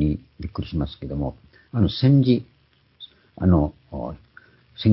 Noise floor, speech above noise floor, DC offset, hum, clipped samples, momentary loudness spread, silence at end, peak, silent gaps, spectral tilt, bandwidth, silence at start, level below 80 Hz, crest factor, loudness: -53 dBFS; 31 dB; under 0.1%; none; under 0.1%; 25 LU; 0 s; -6 dBFS; none; -12.5 dB/octave; 5.8 kHz; 0 s; -36 dBFS; 18 dB; -23 LUFS